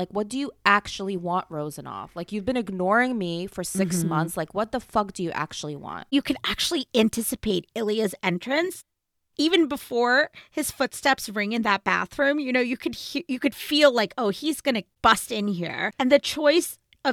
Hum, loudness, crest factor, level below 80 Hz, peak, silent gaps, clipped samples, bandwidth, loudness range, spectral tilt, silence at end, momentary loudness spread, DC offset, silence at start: none; -24 LUFS; 22 dB; -56 dBFS; -4 dBFS; none; under 0.1%; 18 kHz; 3 LU; -4 dB/octave; 0 s; 10 LU; under 0.1%; 0 s